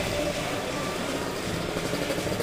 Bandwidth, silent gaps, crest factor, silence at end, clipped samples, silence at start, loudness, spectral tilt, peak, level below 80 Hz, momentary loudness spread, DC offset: 16 kHz; none; 16 dB; 0 s; under 0.1%; 0 s; -29 LUFS; -4 dB/octave; -14 dBFS; -46 dBFS; 2 LU; under 0.1%